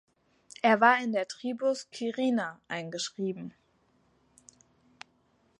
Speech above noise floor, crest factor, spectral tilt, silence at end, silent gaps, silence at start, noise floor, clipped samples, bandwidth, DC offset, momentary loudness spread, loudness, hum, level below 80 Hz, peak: 40 dB; 24 dB; -4 dB/octave; 2.1 s; none; 0.65 s; -69 dBFS; under 0.1%; 11 kHz; under 0.1%; 14 LU; -29 LUFS; none; -80 dBFS; -8 dBFS